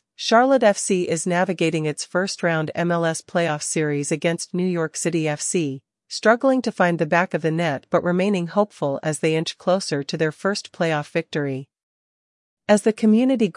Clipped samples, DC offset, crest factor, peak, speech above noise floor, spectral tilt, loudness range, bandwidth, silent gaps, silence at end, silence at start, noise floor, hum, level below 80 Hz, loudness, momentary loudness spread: under 0.1%; under 0.1%; 18 dB; -4 dBFS; over 69 dB; -5 dB/octave; 3 LU; 11.5 kHz; 11.83-12.57 s; 0.05 s; 0.2 s; under -90 dBFS; none; -72 dBFS; -21 LUFS; 7 LU